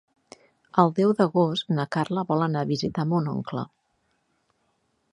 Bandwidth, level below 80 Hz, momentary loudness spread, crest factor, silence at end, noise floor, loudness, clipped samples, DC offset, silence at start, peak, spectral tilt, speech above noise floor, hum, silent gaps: 11 kHz; -64 dBFS; 10 LU; 24 dB; 1.45 s; -71 dBFS; -25 LUFS; under 0.1%; under 0.1%; 0.75 s; -2 dBFS; -7.5 dB/octave; 48 dB; none; none